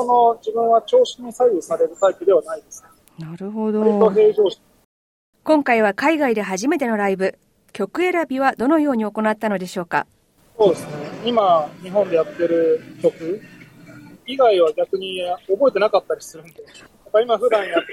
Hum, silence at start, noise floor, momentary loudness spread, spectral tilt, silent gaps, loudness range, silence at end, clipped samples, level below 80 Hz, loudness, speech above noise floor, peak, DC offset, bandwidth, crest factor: none; 0 s; -42 dBFS; 13 LU; -5 dB/octave; 4.85-5.33 s; 2 LU; 0 s; under 0.1%; -64 dBFS; -19 LUFS; 24 dB; -4 dBFS; under 0.1%; 15 kHz; 16 dB